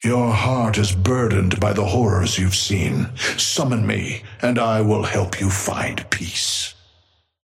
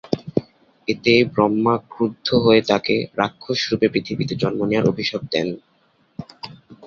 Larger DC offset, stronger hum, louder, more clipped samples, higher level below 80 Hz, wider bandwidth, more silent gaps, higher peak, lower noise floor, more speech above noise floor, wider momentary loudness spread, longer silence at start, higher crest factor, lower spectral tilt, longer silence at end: neither; neither; about the same, -20 LUFS vs -20 LUFS; neither; first, -44 dBFS vs -54 dBFS; first, 15.5 kHz vs 7.2 kHz; neither; second, -4 dBFS vs 0 dBFS; first, -61 dBFS vs -41 dBFS; first, 41 dB vs 22 dB; second, 5 LU vs 20 LU; about the same, 0 s vs 0.05 s; about the same, 16 dB vs 20 dB; second, -4.5 dB/octave vs -6 dB/octave; first, 0.75 s vs 0 s